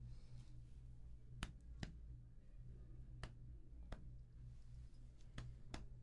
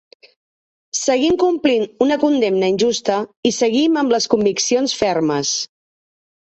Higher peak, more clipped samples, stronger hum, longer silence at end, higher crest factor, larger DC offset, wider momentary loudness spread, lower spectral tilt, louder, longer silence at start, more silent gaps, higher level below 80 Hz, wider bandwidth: second, -28 dBFS vs -2 dBFS; neither; neither; second, 0 s vs 0.8 s; first, 28 dB vs 16 dB; neither; about the same, 7 LU vs 5 LU; first, -5.5 dB/octave vs -3.5 dB/octave; second, -59 LUFS vs -17 LUFS; second, 0 s vs 0.95 s; second, none vs 3.37-3.43 s; about the same, -58 dBFS vs -56 dBFS; first, 10.5 kHz vs 8.4 kHz